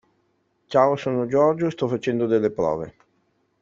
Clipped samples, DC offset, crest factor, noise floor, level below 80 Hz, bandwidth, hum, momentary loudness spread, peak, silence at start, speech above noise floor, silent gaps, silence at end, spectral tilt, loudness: under 0.1%; under 0.1%; 20 dB; -68 dBFS; -60 dBFS; 7.6 kHz; none; 6 LU; -4 dBFS; 0.7 s; 47 dB; none; 0.7 s; -7.5 dB/octave; -22 LUFS